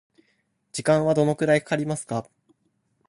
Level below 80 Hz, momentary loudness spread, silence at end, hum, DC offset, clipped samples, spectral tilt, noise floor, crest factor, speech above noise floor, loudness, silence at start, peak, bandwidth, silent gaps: -60 dBFS; 11 LU; 0.85 s; none; under 0.1%; under 0.1%; -6 dB/octave; -71 dBFS; 18 dB; 48 dB; -23 LUFS; 0.75 s; -6 dBFS; 11.5 kHz; none